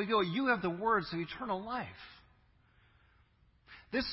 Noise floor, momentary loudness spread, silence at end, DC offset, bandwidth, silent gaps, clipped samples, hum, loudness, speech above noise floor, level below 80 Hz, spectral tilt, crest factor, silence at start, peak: -68 dBFS; 22 LU; 0 s; under 0.1%; 5.8 kHz; none; under 0.1%; none; -34 LUFS; 34 dB; -64 dBFS; -3 dB/octave; 18 dB; 0 s; -18 dBFS